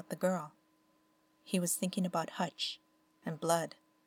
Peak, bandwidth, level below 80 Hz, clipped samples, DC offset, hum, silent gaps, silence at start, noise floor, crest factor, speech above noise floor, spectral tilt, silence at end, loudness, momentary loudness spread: -16 dBFS; 18.5 kHz; -86 dBFS; under 0.1%; under 0.1%; none; none; 0 s; -72 dBFS; 20 dB; 37 dB; -4 dB/octave; 0.35 s; -36 LUFS; 12 LU